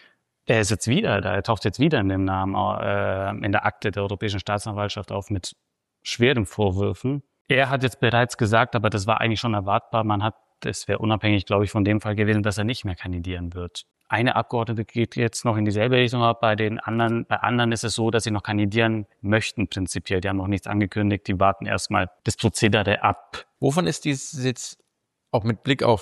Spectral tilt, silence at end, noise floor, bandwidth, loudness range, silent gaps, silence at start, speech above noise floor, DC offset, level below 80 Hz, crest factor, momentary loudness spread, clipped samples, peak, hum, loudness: -5.5 dB/octave; 0 s; -48 dBFS; 12.5 kHz; 3 LU; 7.41-7.45 s; 0.5 s; 25 dB; under 0.1%; -50 dBFS; 18 dB; 9 LU; under 0.1%; -6 dBFS; none; -23 LUFS